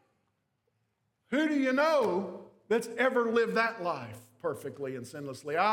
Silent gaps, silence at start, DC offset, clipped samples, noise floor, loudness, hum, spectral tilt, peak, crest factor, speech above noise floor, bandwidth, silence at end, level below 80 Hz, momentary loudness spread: none; 1.3 s; under 0.1%; under 0.1%; -78 dBFS; -30 LUFS; none; -5 dB/octave; -14 dBFS; 18 dB; 48 dB; 17.5 kHz; 0 s; -82 dBFS; 14 LU